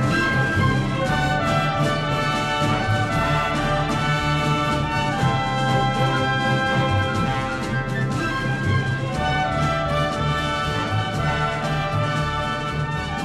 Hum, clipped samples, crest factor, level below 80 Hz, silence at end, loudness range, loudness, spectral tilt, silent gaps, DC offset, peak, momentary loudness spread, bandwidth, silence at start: none; under 0.1%; 14 dB; -36 dBFS; 0 s; 2 LU; -21 LUFS; -5.5 dB/octave; none; under 0.1%; -8 dBFS; 4 LU; 13.5 kHz; 0 s